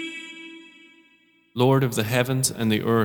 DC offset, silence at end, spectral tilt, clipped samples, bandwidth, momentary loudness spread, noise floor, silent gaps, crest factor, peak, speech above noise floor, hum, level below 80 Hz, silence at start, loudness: under 0.1%; 0 s; -5 dB/octave; under 0.1%; 19 kHz; 20 LU; -60 dBFS; none; 20 dB; -4 dBFS; 39 dB; none; -60 dBFS; 0 s; -22 LUFS